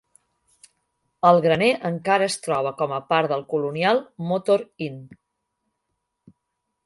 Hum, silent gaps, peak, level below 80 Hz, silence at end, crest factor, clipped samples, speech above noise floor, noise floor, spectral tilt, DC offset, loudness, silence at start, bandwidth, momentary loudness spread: none; none; -2 dBFS; -66 dBFS; 1.8 s; 22 dB; under 0.1%; 57 dB; -78 dBFS; -5 dB/octave; under 0.1%; -22 LUFS; 1.25 s; 11.5 kHz; 10 LU